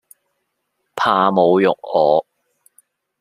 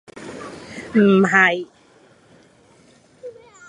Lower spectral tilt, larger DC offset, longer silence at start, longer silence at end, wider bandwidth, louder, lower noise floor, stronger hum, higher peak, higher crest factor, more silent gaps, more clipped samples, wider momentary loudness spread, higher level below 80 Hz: about the same, -6.5 dB/octave vs -6 dB/octave; neither; first, 0.95 s vs 0.15 s; first, 1 s vs 0.4 s; first, 14 kHz vs 10.5 kHz; about the same, -16 LUFS vs -16 LUFS; first, -73 dBFS vs -53 dBFS; neither; about the same, -2 dBFS vs -2 dBFS; about the same, 18 dB vs 20 dB; neither; neither; second, 6 LU vs 26 LU; about the same, -66 dBFS vs -62 dBFS